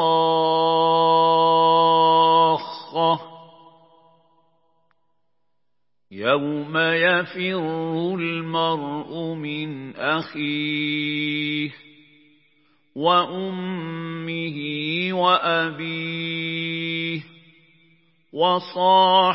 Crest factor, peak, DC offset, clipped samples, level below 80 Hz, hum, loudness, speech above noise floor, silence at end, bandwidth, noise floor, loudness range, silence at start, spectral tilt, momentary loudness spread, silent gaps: 18 dB; -4 dBFS; under 0.1%; under 0.1%; -78 dBFS; none; -21 LUFS; 58 dB; 0 s; 5.8 kHz; -81 dBFS; 8 LU; 0 s; -9.5 dB/octave; 13 LU; none